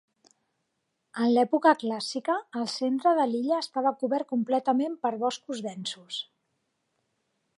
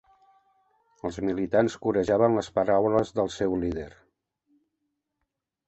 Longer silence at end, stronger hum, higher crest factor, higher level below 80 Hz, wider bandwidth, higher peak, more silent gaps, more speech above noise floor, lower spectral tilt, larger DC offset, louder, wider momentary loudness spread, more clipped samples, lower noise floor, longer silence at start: second, 1.35 s vs 1.8 s; neither; about the same, 20 dB vs 20 dB; second, -86 dBFS vs -52 dBFS; first, 11.5 kHz vs 8.2 kHz; about the same, -8 dBFS vs -8 dBFS; neither; second, 52 dB vs 57 dB; second, -4.5 dB/octave vs -6.5 dB/octave; neither; about the same, -27 LUFS vs -26 LUFS; about the same, 12 LU vs 13 LU; neither; about the same, -79 dBFS vs -82 dBFS; about the same, 1.15 s vs 1.05 s